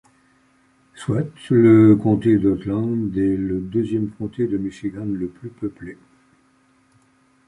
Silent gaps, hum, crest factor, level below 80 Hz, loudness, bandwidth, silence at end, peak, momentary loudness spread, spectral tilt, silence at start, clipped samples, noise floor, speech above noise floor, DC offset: none; none; 18 dB; -48 dBFS; -20 LUFS; 10.5 kHz; 1.55 s; -2 dBFS; 18 LU; -9 dB/octave; 0.95 s; under 0.1%; -59 dBFS; 40 dB; under 0.1%